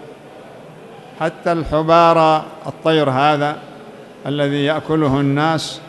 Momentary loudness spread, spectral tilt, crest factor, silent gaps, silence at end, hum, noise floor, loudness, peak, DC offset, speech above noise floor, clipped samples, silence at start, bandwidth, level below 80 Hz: 17 LU; -6.5 dB/octave; 16 dB; none; 0 s; none; -38 dBFS; -16 LUFS; 0 dBFS; under 0.1%; 22 dB; under 0.1%; 0 s; 12 kHz; -44 dBFS